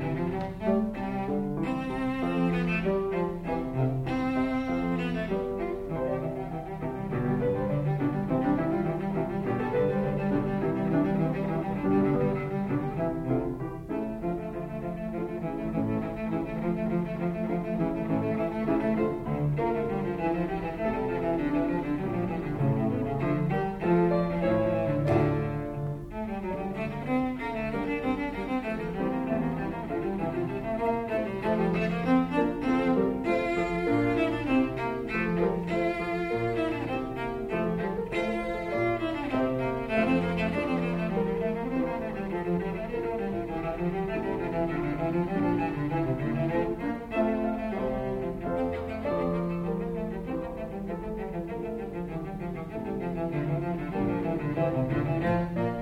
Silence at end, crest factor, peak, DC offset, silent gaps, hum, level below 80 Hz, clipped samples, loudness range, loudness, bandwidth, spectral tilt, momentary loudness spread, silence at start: 0 s; 16 dB; -12 dBFS; under 0.1%; none; none; -46 dBFS; under 0.1%; 5 LU; -29 LUFS; 13.5 kHz; -8.5 dB/octave; 7 LU; 0 s